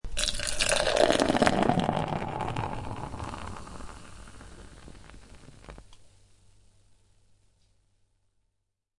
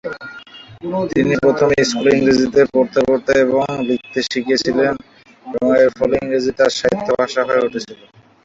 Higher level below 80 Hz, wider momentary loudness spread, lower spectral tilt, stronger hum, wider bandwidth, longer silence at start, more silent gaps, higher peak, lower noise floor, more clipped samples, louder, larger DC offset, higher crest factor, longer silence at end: about the same, -44 dBFS vs -48 dBFS; first, 26 LU vs 14 LU; about the same, -4 dB/octave vs -5 dB/octave; neither; first, 11.5 kHz vs 8 kHz; about the same, 0.05 s vs 0.05 s; neither; about the same, -4 dBFS vs -2 dBFS; first, -80 dBFS vs -38 dBFS; neither; second, -27 LUFS vs -16 LUFS; first, 0.1% vs under 0.1%; first, 28 dB vs 14 dB; first, 2.45 s vs 0.5 s